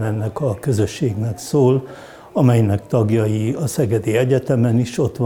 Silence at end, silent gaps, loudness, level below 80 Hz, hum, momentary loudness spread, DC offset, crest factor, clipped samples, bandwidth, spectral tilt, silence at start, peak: 0 s; none; -18 LUFS; -50 dBFS; none; 6 LU; under 0.1%; 16 dB; under 0.1%; 16.5 kHz; -7.5 dB/octave; 0 s; -2 dBFS